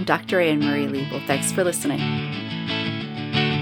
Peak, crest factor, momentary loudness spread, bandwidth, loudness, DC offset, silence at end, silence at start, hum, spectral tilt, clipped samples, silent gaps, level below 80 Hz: -4 dBFS; 20 dB; 7 LU; 19 kHz; -23 LUFS; under 0.1%; 0 s; 0 s; none; -4.5 dB/octave; under 0.1%; none; -60 dBFS